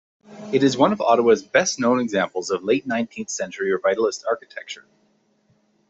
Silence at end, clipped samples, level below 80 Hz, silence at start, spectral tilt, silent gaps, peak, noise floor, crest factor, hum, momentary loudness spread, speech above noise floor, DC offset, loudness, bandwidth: 1.1 s; under 0.1%; -66 dBFS; 0.3 s; -4 dB/octave; none; -2 dBFS; -64 dBFS; 20 dB; none; 13 LU; 43 dB; under 0.1%; -21 LUFS; 8.2 kHz